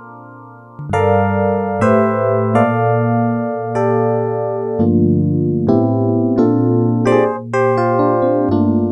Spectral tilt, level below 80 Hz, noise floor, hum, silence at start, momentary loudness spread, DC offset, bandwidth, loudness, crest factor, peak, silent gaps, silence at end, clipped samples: -9.5 dB/octave; -50 dBFS; -37 dBFS; none; 0 s; 4 LU; under 0.1%; 9.4 kHz; -15 LUFS; 14 dB; 0 dBFS; none; 0 s; under 0.1%